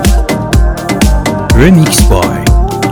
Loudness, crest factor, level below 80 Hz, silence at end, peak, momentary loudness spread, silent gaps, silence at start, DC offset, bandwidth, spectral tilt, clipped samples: -9 LUFS; 8 dB; -12 dBFS; 0 s; 0 dBFS; 6 LU; none; 0 s; under 0.1%; 20 kHz; -5.5 dB/octave; 0.9%